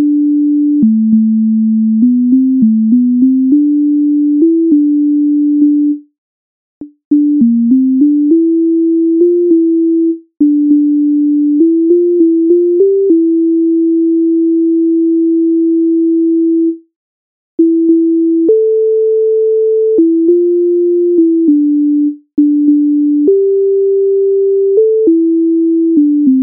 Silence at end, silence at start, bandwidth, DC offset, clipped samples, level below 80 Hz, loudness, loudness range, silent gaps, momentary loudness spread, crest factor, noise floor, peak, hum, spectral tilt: 0 s; 0 s; 0.7 kHz; under 0.1%; under 0.1%; -64 dBFS; -10 LUFS; 2 LU; 6.18-6.81 s, 7.05-7.11 s, 16.96-17.58 s; 2 LU; 8 dB; under -90 dBFS; 0 dBFS; none; -12.5 dB/octave